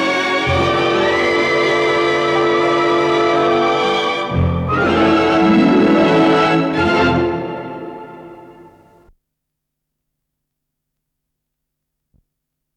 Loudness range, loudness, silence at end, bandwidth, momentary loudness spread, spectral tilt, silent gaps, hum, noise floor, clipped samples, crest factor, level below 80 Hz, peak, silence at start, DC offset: 8 LU; -14 LUFS; 4.25 s; 9.8 kHz; 8 LU; -6 dB/octave; none; none; -77 dBFS; under 0.1%; 14 dB; -44 dBFS; -2 dBFS; 0 s; under 0.1%